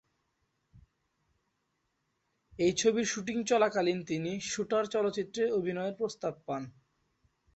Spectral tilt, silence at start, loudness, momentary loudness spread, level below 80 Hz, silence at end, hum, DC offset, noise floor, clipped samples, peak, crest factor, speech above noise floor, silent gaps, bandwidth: -4 dB/octave; 0.75 s; -31 LUFS; 10 LU; -70 dBFS; 0.85 s; none; under 0.1%; -80 dBFS; under 0.1%; -14 dBFS; 20 dB; 49 dB; none; 8.4 kHz